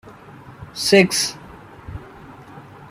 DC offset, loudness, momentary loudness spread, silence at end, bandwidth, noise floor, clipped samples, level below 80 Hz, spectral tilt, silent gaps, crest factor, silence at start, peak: under 0.1%; -17 LUFS; 27 LU; 0.05 s; 15.5 kHz; -42 dBFS; under 0.1%; -50 dBFS; -3.5 dB/octave; none; 22 dB; 0.05 s; -2 dBFS